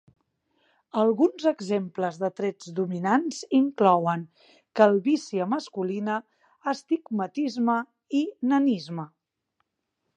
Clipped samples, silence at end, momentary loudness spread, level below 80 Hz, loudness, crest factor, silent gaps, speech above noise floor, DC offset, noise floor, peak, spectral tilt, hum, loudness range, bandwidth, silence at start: under 0.1%; 1.1 s; 11 LU; -80 dBFS; -26 LUFS; 22 dB; none; 55 dB; under 0.1%; -80 dBFS; -4 dBFS; -6.5 dB/octave; none; 4 LU; 9.2 kHz; 0.95 s